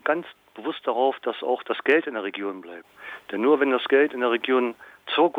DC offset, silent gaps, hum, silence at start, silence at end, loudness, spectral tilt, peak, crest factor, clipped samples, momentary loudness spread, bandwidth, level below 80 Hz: under 0.1%; none; none; 0.05 s; 0 s; -24 LUFS; -5.5 dB/octave; -8 dBFS; 16 dB; under 0.1%; 19 LU; 4.8 kHz; -78 dBFS